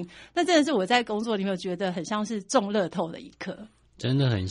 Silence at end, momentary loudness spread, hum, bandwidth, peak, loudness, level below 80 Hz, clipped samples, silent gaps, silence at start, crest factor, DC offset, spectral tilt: 0 s; 16 LU; none; 11 kHz; -6 dBFS; -26 LUFS; -62 dBFS; under 0.1%; none; 0 s; 20 dB; under 0.1%; -5 dB/octave